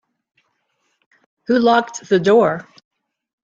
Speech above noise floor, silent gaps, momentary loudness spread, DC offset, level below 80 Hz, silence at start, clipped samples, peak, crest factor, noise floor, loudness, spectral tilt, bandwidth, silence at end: 54 dB; none; 12 LU; under 0.1%; -62 dBFS; 1.5 s; under 0.1%; -2 dBFS; 18 dB; -69 dBFS; -16 LUFS; -5.5 dB/octave; 7.6 kHz; 0.85 s